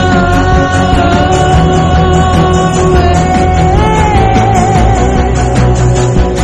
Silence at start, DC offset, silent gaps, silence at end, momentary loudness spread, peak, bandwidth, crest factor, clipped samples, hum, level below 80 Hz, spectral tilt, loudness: 0 s; under 0.1%; none; 0 s; 2 LU; 0 dBFS; 11.5 kHz; 8 dB; 1%; none; -16 dBFS; -6 dB/octave; -8 LUFS